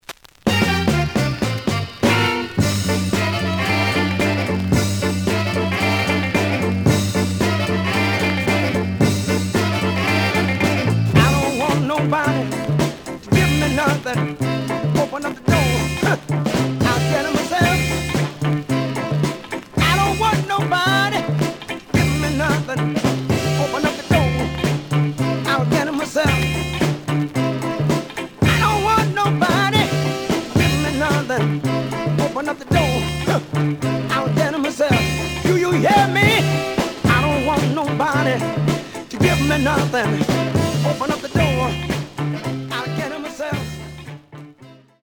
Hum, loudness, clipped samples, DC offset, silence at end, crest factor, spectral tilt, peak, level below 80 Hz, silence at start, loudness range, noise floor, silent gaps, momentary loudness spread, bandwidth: none; -19 LUFS; under 0.1%; under 0.1%; 0.3 s; 18 dB; -5.5 dB/octave; -2 dBFS; -40 dBFS; 0.1 s; 3 LU; -45 dBFS; none; 6 LU; over 20 kHz